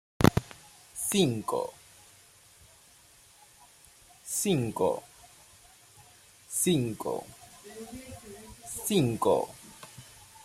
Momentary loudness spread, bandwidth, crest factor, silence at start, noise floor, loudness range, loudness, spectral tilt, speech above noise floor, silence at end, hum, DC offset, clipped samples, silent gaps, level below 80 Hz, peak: 23 LU; 16 kHz; 28 dB; 0.2 s; -58 dBFS; 4 LU; -29 LUFS; -5 dB/octave; 30 dB; 0.05 s; none; under 0.1%; under 0.1%; none; -54 dBFS; -4 dBFS